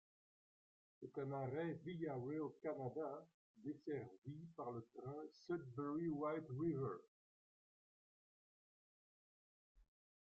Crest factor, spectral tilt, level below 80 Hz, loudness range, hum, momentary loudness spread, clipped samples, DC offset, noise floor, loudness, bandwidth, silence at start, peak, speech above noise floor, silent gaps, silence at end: 18 dB; -8 dB/octave; -84 dBFS; 4 LU; none; 11 LU; under 0.1%; under 0.1%; under -90 dBFS; -48 LUFS; 7.4 kHz; 1 s; -32 dBFS; over 43 dB; 3.34-3.54 s, 4.18-4.22 s, 7.08-9.75 s; 0.55 s